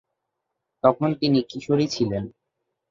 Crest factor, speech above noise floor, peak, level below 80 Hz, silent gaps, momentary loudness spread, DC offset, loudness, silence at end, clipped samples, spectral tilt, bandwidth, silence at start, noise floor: 22 dB; 59 dB; -2 dBFS; -56 dBFS; none; 7 LU; under 0.1%; -23 LUFS; 0.6 s; under 0.1%; -6.5 dB/octave; 7.6 kHz; 0.85 s; -81 dBFS